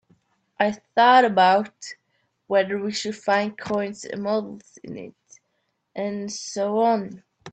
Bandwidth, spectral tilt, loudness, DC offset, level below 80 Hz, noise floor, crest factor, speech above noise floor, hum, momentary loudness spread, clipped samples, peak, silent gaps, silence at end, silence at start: 9 kHz; -4 dB/octave; -22 LUFS; under 0.1%; -68 dBFS; -74 dBFS; 18 dB; 51 dB; none; 23 LU; under 0.1%; -4 dBFS; none; 0.05 s; 0.6 s